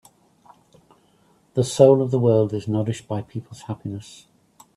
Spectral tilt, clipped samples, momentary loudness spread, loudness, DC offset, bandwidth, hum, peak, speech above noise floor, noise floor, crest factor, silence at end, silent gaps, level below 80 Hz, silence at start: -7 dB/octave; under 0.1%; 19 LU; -21 LUFS; under 0.1%; 12.5 kHz; none; 0 dBFS; 39 dB; -60 dBFS; 22 dB; 0.75 s; none; -60 dBFS; 1.55 s